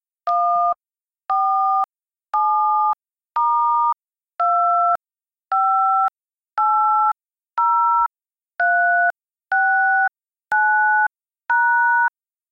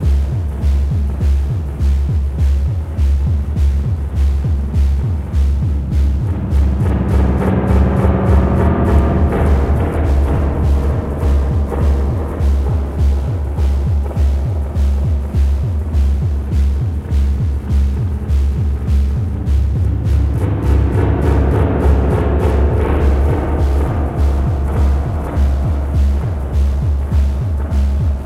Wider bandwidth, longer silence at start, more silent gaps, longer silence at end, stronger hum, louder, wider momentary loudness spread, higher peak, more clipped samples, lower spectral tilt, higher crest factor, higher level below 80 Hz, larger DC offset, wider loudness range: about the same, 6.4 kHz vs 6.2 kHz; first, 0.25 s vs 0 s; neither; first, 0.45 s vs 0 s; neither; about the same, -18 LUFS vs -16 LUFS; first, 9 LU vs 4 LU; second, -10 dBFS vs 0 dBFS; neither; second, -2.5 dB/octave vs -9 dB/octave; about the same, 10 dB vs 14 dB; second, -64 dBFS vs -16 dBFS; neither; about the same, 2 LU vs 3 LU